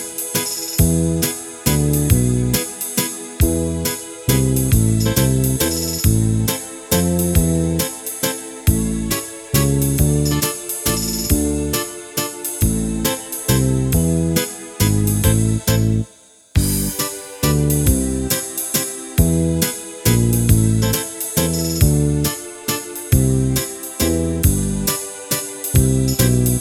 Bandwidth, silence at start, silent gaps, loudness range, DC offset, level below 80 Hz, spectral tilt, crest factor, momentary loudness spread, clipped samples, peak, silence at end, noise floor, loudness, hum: over 20 kHz; 0 s; none; 2 LU; under 0.1%; -28 dBFS; -5 dB/octave; 16 dB; 6 LU; under 0.1%; 0 dBFS; 0 s; -47 dBFS; -18 LUFS; none